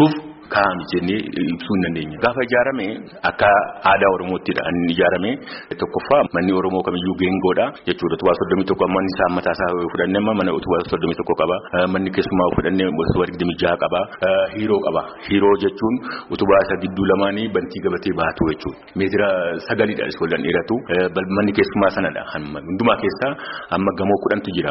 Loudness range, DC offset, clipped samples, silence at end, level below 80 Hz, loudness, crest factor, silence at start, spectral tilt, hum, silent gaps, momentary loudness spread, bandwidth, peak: 2 LU; under 0.1%; under 0.1%; 0 s; -46 dBFS; -19 LUFS; 16 dB; 0 s; -4.5 dB/octave; none; none; 7 LU; 5.8 kHz; -2 dBFS